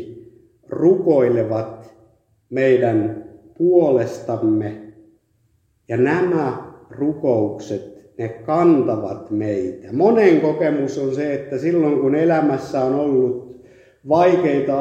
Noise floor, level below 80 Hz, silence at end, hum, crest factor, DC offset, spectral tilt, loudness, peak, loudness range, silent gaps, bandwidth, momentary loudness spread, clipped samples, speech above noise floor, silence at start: -62 dBFS; -62 dBFS; 0 s; none; 16 dB; under 0.1%; -8 dB/octave; -18 LUFS; -2 dBFS; 4 LU; none; 8 kHz; 15 LU; under 0.1%; 45 dB; 0 s